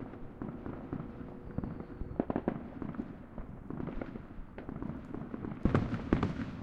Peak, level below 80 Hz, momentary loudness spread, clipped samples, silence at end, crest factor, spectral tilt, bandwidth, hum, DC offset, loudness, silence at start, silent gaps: -10 dBFS; -48 dBFS; 14 LU; under 0.1%; 0 s; 28 dB; -9 dB/octave; 8.2 kHz; none; under 0.1%; -39 LUFS; 0 s; none